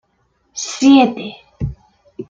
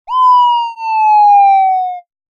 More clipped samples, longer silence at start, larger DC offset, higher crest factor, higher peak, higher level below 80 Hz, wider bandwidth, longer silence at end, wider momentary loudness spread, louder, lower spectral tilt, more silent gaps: neither; first, 0.55 s vs 0.1 s; neither; first, 16 dB vs 8 dB; about the same, -2 dBFS vs -2 dBFS; first, -42 dBFS vs -70 dBFS; about the same, 7.6 kHz vs 7 kHz; second, 0.05 s vs 0.35 s; first, 20 LU vs 10 LU; second, -13 LUFS vs -10 LUFS; first, -4.5 dB/octave vs 2.5 dB/octave; neither